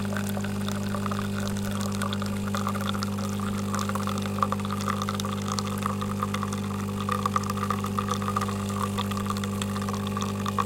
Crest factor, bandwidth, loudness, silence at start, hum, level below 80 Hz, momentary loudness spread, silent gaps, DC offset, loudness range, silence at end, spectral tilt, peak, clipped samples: 22 dB; 17 kHz; -29 LUFS; 0 s; 50 Hz at -30 dBFS; -50 dBFS; 2 LU; none; under 0.1%; 1 LU; 0 s; -5 dB/octave; -6 dBFS; under 0.1%